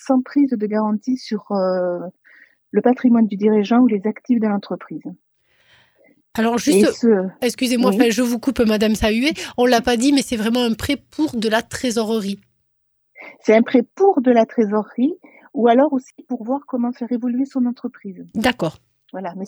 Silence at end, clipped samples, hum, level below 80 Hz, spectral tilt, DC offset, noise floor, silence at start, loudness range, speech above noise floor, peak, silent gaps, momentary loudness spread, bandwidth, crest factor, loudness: 0 s; under 0.1%; none; -48 dBFS; -5 dB/octave; under 0.1%; -67 dBFS; 0.05 s; 4 LU; 49 dB; 0 dBFS; none; 14 LU; 16 kHz; 18 dB; -18 LUFS